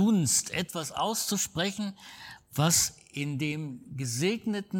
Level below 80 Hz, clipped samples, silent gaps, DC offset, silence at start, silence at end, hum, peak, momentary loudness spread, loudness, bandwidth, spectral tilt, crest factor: -62 dBFS; under 0.1%; none; under 0.1%; 0 s; 0 s; none; -12 dBFS; 14 LU; -29 LUFS; 19 kHz; -3.5 dB/octave; 18 dB